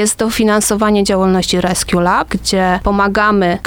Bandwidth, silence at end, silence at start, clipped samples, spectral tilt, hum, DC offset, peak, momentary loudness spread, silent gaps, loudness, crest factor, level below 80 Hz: 19.5 kHz; 0 s; 0 s; under 0.1%; -4 dB/octave; none; under 0.1%; -2 dBFS; 2 LU; none; -13 LUFS; 12 dB; -32 dBFS